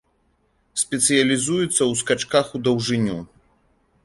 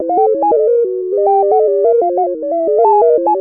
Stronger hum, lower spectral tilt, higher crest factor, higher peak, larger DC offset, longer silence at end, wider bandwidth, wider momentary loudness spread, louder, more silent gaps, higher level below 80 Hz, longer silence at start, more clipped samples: neither; second, -3.5 dB/octave vs -11.5 dB/octave; first, 18 dB vs 10 dB; about the same, -4 dBFS vs -2 dBFS; second, under 0.1% vs 0.1%; first, 0.8 s vs 0 s; first, 11.5 kHz vs 2.7 kHz; about the same, 8 LU vs 6 LU; second, -20 LUFS vs -12 LUFS; neither; first, -56 dBFS vs -64 dBFS; first, 0.75 s vs 0 s; neither